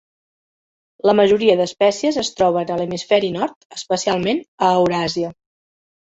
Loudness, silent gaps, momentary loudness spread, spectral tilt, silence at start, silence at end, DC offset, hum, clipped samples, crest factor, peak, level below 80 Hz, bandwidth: -18 LUFS; 3.56-3.70 s, 4.48-4.58 s; 10 LU; -4.5 dB/octave; 1.05 s; 0.85 s; under 0.1%; none; under 0.1%; 18 dB; -2 dBFS; -56 dBFS; 8 kHz